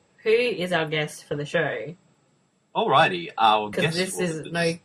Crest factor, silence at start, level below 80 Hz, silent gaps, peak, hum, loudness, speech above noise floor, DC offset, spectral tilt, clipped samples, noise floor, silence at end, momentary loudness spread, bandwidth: 18 dB; 0.25 s; -64 dBFS; none; -6 dBFS; none; -24 LUFS; 42 dB; under 0.1%; -4.5 dB/octave; under 0.1%; -65 dBFS; 0.05 s; 11 LU; 13 kHz